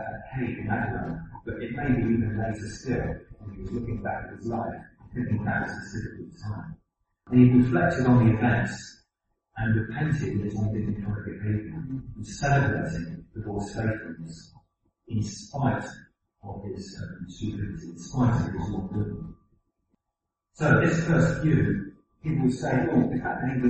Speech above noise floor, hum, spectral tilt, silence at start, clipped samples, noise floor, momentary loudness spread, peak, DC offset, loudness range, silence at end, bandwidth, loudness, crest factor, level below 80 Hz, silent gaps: 58 dB; none; -7.5 dB/octave; 0 s; under 0.1%; -84 dBFS; 18 LU; -6 dBFS; under 0.1%; 9 LU; 0 s; 8.4 kHz; -27 LUFS; 22 dB; -46 dBFS; none